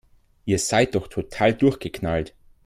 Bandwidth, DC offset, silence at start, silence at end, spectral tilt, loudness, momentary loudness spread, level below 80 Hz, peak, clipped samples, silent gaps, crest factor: 15.5 kHz; under 0.1%; 0.45 s; 0.35 s; -5 dB/octave; -23 LUFS; 12 LU; -46 dBFS; -4 dBFS; under 0.1%; none; 18 dB